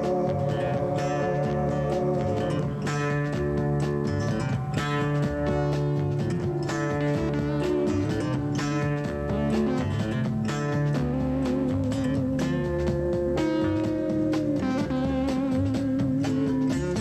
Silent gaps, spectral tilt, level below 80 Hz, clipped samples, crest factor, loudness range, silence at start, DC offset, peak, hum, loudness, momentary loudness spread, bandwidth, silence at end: none; -7.5 dB/octave; -42 dBFS; under 0.1%; 12 dB; 1 LU; 0 s; under 0.1%; -14 dBFS; none; -26 LUFS; 2 LU; 12 kHz; 0 s